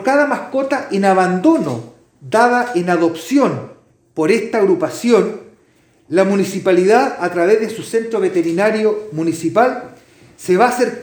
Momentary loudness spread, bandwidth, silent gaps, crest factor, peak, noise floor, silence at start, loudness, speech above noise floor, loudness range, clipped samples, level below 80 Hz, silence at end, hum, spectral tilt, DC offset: 7 LU; over 20 kHz; none; 16 dB; 0 dBFS; -54 dBFS; 0 s; -15 LUFS; 39 dB; 2 LU; under 0.1%; -64 dBFS; 0 s; none; -5.5 dB/octave; under 0.1%